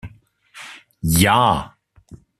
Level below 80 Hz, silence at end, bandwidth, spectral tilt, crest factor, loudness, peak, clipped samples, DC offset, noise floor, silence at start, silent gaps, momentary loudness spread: -42 dBFS; 0.25 s; 14.5 kHz; -4 dB/octave; 18 dB; -17 LUFS; -2 dBFS; under 0.1%; under 0.1%; -50 dBFS; 0.05 s; none; 24 LU